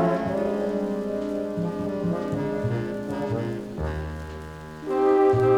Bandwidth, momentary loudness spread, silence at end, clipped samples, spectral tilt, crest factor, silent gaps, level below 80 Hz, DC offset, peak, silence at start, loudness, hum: 12 kHz; 14 LU; 0 s; under 0.1%; -8.5 dB/octave; 16 dB; none; -44 dBFS; under 0.1%; -10 dBFS; 0 s; -26 LUFS; none